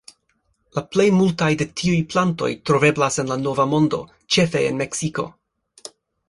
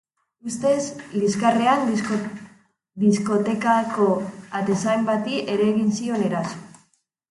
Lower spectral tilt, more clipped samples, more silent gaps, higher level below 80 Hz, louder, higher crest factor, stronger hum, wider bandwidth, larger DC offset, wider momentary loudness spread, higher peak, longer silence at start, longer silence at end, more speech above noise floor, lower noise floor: about the same, -5 dB/octave vs -5.5 dB/octave; neither; neither; first, -54 dBFS vs -66 dBFS; about the same, -20 LUFS vs -22 LUFS; about the same, 18 dB vs 18 dB; neither; about the same, 11.5 kHz vs 11.5 kHz; neither; about the same, 13 LU vs 11 LU; first, -2 dBFS vs -6 dBFS; first, 0.75 s vs 0.45 s; first, 1 s vs 0.65 s; first, 48 dB vs 43 dB; about the same, -68 dBFS vs -65 dBFS